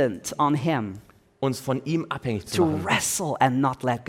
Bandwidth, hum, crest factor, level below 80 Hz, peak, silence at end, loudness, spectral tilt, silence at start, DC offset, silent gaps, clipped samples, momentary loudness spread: 17 kHz; none; 20 dB; -58 dBFS; -4 dBFS; 0.05 s; -25 LUFS; -4.5 dB/octave; 0 s; under 0.1%; none; under 0.1%; 7 LU